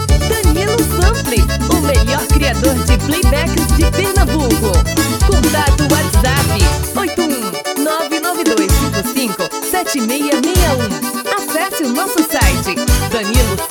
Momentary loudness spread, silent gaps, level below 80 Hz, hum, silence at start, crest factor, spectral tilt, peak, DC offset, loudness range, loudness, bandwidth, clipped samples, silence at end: 4 LU; none; -18 dBFS; none; 0 s; 14 dB; -4.5 dB/octave; 0 dBFS; under 0.1%; 2 LU; -14 LUFS; over 20 kHz; under 0.1%; 0 s